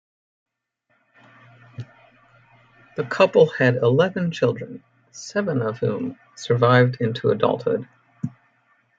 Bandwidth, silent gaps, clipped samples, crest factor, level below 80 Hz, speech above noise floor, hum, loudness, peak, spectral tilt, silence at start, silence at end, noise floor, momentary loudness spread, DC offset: 7.8 kHz; none; under 0.1%; 20 dB; -64 dBFS; 50 dB; none; -21 LUFS; -4 dBFS; -6.5 dB/octave; 1.8 s; 0.7 s; -70 dBFS; 21 LU; under 0.1%